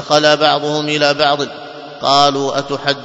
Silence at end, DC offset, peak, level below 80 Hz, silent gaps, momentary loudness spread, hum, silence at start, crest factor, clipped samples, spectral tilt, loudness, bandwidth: 0 s; under 0.1%; 0 dBFS; -56 dBFS; none; 11 LU; none; 0 s; 14 dB; under 0.1%; -3.5 dB/octave; -14 LUFS; 8 kHz